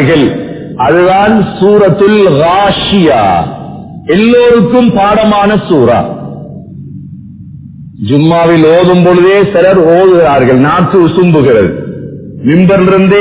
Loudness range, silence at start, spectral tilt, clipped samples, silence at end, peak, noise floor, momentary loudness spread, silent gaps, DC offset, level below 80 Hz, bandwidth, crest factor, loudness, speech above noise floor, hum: 5 LU; 0 s; -11 dB/octave; 2%; 0 s; 0 dBFS; -27 dBFS; 17 LU; none; under 0.1%; -34 dBFS; 4 kHz; 6 dB; -6 LUFS; 22 dB; none